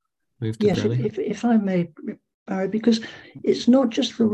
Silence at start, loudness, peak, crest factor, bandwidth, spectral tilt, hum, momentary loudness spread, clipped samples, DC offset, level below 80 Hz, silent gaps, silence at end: 0.4 s; -22 LUFS; -6 dBFS; 16 dB; 8.6 kHz; -6.5 dB/octave; none; 14 LU; under 0.1%; under 0.1%; -58 dBFS; 2.34-2.46 s; 0 s